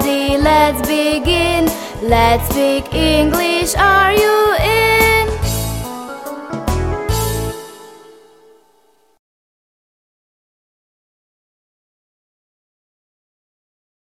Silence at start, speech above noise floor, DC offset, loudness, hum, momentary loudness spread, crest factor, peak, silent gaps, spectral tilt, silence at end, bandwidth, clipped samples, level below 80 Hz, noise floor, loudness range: 0 s; 43 dB; 0.1%; -14 LUFS; none; 14 LU; 18 dB; 0 dBFS; none; -4.5 dB/octave; 6.05 s; 16.5 kHz; under 0.1%; -28 dBFS; -56 dBFS; 11 LU